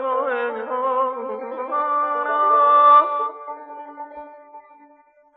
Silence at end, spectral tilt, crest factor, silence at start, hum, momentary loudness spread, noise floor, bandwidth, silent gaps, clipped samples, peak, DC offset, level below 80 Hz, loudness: 0.75 s; -5.5 dB/octave; 16 dB; 0 s; none; 23 LU; -54 dBFS; 4 kHz; none; under 0.1%; -4 dBFS; under 0.1%; -78 dBFS; -18 LUFS